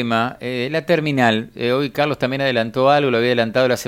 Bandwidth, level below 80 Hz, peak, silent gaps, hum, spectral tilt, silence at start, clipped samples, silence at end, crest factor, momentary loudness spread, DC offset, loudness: 16.5 kHz; -56 dBFS; -2 dBFS; none; none; -5.5 dB/octave; 0 s; under 0.1%; 0 s; 16 dB; 6 LU; under 0.1%; -18 LUFS